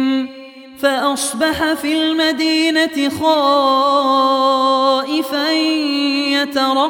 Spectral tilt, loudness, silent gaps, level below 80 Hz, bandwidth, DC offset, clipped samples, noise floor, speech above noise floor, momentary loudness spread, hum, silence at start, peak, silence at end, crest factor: -2.5 dB/octave; -15 LUFS; none; -54 dBFS; 18 kHz; under 0.1%; under 0.1%; -36 dBFS; 21 dB; 5 LU; none; 0 s; -2 dBFS; 0 s; 12 dB